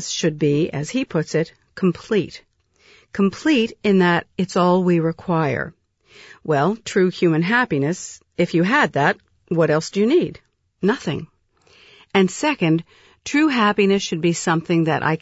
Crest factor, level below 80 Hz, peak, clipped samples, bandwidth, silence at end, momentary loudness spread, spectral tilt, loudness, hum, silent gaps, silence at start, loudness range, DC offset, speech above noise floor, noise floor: 16 dB; -58 dBFS; -4 dBFS; under 0.1%; 8 kHz; 0.05 s; 9 LU; -5.5 dB/octave; -20 LUFS; none; none; 0 s; 3 LU; under 0.1%; 37 dB; -56 dBFS